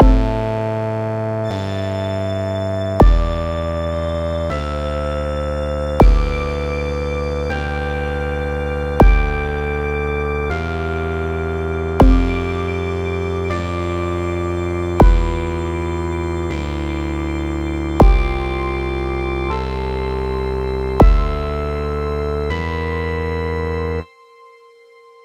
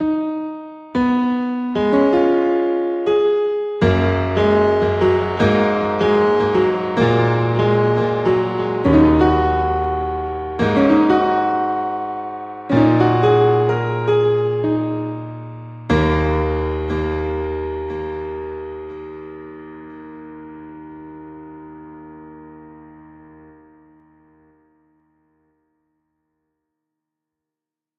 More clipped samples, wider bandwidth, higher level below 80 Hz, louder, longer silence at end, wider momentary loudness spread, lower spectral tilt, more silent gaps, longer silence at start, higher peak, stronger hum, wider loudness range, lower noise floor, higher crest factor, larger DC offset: neither; first, 8.8 kHz vs 7.2 kHz; first, -20 dBFS vs -38 dBFS; about the same, -20 LUFS vs -18 LUFS; second, 1.2 s vs 5 s; second, 8 LU vs 22 LU; about the same, -7.5 dB/octave vs -8.5 dB/octave; neither; about the same, 0 s vs 0 s; about the same, 0 dBFS vs -2 dBFS; neither; second, 1 LU vs 19 LU; second, -46 dBFS vs -87 dBFS; about the same, 18 dB vs 16 dB; neither